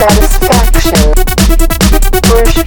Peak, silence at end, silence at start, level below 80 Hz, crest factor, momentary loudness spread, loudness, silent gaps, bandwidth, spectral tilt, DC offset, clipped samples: 0 dBFS; 0 s; 0 s; -8 dBFS; 6 dB; 2 LU; -9 LUFS; none; over 20 kHz; -4.5 dB/octave; under 0.1%; 2%